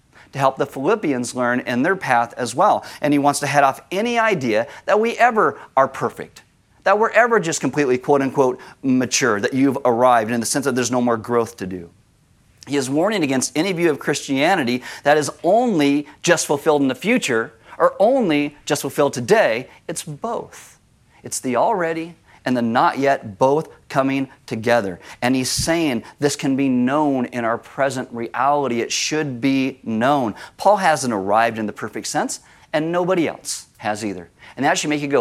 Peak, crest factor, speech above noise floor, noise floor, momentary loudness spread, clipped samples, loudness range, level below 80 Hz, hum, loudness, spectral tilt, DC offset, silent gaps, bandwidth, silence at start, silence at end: 0 dBFS; 18 dB; 37 dB; -56 dBFS; 10 LU; under 0.1%; 4 LU; -56 dBFS; none; -19 LUFS; -4 dB/octave; under 0.1%; none; 15.5 kHz; 0.35 s; 0 s